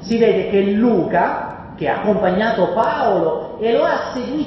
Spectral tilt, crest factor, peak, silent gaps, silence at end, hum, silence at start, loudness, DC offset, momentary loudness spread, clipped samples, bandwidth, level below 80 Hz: -7.5 dB/octave; 14 dB; -2 dBFS; none; 0 s; none; 0 s; -17 LUFS; under 0.1%; 7 LU; under 0.1%; 7.6 kHz; -48 dBFS